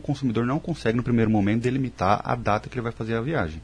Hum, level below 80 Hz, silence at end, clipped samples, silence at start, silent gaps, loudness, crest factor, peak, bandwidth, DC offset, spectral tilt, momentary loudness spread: none; -46 dBFS; 0 s; under 0.1%; 0 s; none; -25 LUFS; 18 dB; -6 dBFS; 10 kHz; under 0.1%; -7.5 dB/octave; 6 LU